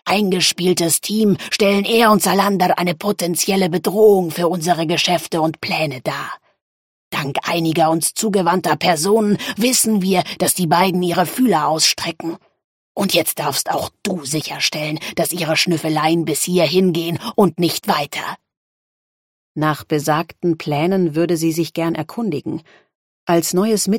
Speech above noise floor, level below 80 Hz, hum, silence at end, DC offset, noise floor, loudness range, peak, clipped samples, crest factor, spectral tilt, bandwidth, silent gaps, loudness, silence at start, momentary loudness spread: over 73 dB; -60 dBFS; none; 0 s; under 0.1%; under -90 dBFS; 5 LU; -2 dBFS; under 0.1%; 16 dB; -4 dB/octave; 17 kHz; 6.62-7.11 s, 12.64-12.95 s, 18.57-19.55 s, 22.95-23.27 s; -17 LUFS; 0.05 s; 9 LU